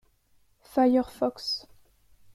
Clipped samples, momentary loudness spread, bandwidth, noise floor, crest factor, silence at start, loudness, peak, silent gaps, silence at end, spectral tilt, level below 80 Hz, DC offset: under 0.1%; 9 LU; 13.5 kHz; -65 dBFS; 18 dB; 0.75 s; -27 LUFS; -12 dBFS; none; 0.75 s; -4.5 dB/octave; -62 dBFS; under 0.1%